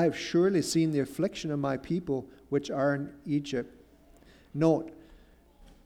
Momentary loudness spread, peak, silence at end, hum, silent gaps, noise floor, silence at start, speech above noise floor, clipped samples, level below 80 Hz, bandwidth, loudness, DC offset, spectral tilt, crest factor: 10 LU; -12 dBFS; 0.85 s; none; none; -57 dBFS; 0 s; 28 dB; under 0.1%; -60 dBFS; 15 kHz; -30 LUFS; under 0.1%; -6 dB/octave; 18 dB